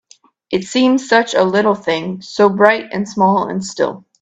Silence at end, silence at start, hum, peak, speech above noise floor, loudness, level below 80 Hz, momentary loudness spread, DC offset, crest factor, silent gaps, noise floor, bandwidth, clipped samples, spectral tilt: 0.2 s; 0.5 s; none; 0 dBFS; 35 dB; -15 LUFS; -58 dBFS; 10 LU; under 0.1%; 16 dB; none; -50 dBFS; 9 kHz; under 0.1%; -5 dB/octave